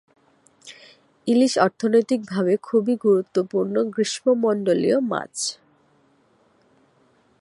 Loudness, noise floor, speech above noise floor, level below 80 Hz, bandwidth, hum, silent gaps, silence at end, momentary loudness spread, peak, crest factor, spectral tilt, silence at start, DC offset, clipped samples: -21 LUFS; -61 dBFS; 40 dB; -72 dBFS; 11.5 kHz; none; none; 1.85 s; 8 LU; -2 dBFS; 20 dB; -5 dB/octave; 0.65 s; under 0.1%; under 0.1%